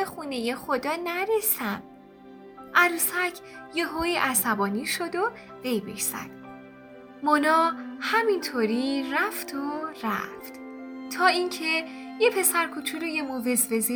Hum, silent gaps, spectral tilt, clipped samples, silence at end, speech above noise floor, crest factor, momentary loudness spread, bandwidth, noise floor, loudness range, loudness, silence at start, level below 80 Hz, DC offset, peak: none; none; -2.5 dB/octave; under 0.1%; 0 s; 22 dB; 22 dB; 15 LU; over 20 kHz; -48 dBFS; 3 LU; -26 LUFS; 0 s; -62 dBFS; under 0.1%; -6 dBFS